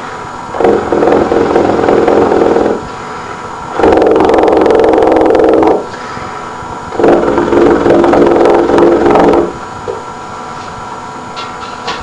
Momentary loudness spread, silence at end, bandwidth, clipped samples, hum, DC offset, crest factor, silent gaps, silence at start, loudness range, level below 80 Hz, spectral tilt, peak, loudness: 15 LU; 0 s; 10.5 kHz; under 0.1%; none; 0.4%; 10 dB; none; 0 s; 2 LU; -34 dBFS; -6.5 dB/octave; 0 dBFS; -8 LUFS